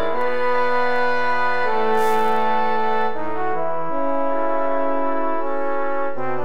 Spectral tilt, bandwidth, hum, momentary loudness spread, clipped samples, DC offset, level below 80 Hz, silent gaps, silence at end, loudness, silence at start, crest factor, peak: -5.5 dB/octave; 16 kHz; none; 5 LU; under 0.1%; 10%; -66 dBFS; none; 0 s; -22 LUFS; 0 s; 14 dB; -6 dBFS